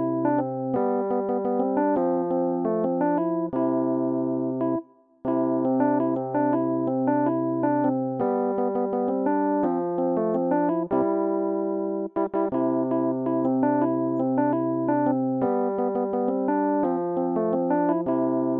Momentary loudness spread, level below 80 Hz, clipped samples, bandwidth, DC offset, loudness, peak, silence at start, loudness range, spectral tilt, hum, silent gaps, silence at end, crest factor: 3 LU; -68 dBFS; under 0.1%; 3.2 kHz; under 0.1%; -25 LUFS; -12 dBFS; 0 s; 1 LU; -12.5 dB/octave; none; none; 0 s; 12 dB